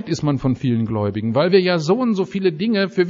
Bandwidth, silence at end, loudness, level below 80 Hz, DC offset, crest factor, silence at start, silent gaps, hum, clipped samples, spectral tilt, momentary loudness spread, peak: 7.6 kHz; 0 s; -19 LUFS; -50 dBFS; under 0.1%; 16 dB; 0 s; none; none; under 0.1%; -6 dB/octave; 5 LU; -2 dBFS